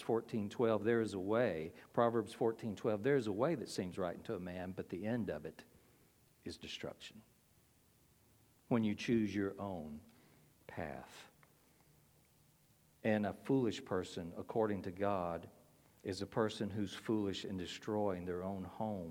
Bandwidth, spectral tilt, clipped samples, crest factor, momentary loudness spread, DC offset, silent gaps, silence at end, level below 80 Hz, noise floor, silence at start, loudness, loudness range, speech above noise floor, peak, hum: 17 kHz; -6.5 dB/octave; under 0.1%; 22 dB; 14 LU; under 0.1%; none; 0 s; -72 dBFS; -71 dBFS; 0 s; -39 LUFS; 10 LU; 32 dB; -18 dBFS; none